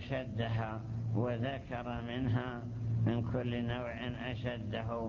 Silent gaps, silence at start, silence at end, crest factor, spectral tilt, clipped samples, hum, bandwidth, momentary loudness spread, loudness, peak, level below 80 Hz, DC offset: none; 0 s; 0 s; 16 dB; -8.5 dB/octave; under 0.1%; none; 6.8 kHz; 6 LU; -37 LUFS; -20 dBFS; -52 dBFS; under 0.1%